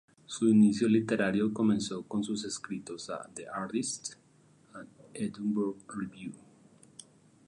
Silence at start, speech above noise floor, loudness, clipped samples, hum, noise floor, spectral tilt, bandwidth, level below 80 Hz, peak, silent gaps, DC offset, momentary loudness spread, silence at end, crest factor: 0.3 s; 33 dB; -31 LUFS; under 0.1%; none; -63 dBFS; -5.5 dB/octave; 11 kHz; -70 dBFS; -14 dBFS; none; under 0.1%; 23 LU; 1.1 s; 18 dB